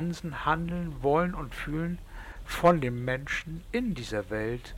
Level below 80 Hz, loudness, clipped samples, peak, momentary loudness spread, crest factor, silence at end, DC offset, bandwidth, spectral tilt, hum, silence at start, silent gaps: -44 dBFS; -30 LUFS; under 0.1%; -10 dBFS; 12 LU; 20 dB; 0 s; under 0.1%; 16.5 kHz; -6.5 dB/octave; none; 0 s; none